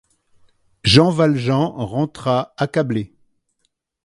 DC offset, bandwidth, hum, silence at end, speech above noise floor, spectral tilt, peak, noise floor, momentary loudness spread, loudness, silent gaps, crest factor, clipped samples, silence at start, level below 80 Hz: under 0.1%; 11.5 kHz; none; 1 s; 53 dB; -6 dB/octave; 0 dBFS; -70 dBFS; 10 LU; -18 LUFS; none; 20 dB; under 0.1%; 0.85 s; -46 dBFS